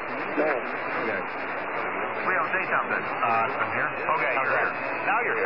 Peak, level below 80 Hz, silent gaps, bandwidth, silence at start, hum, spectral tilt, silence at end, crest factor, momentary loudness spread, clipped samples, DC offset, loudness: -12 dBFS; -74 dBFS; none; 5.8 kHz; 0 s; none; -7.5 dB/octave; 0 s; 14 dB; 5 LU; under 0.1%; 0.4%; -26 LUFS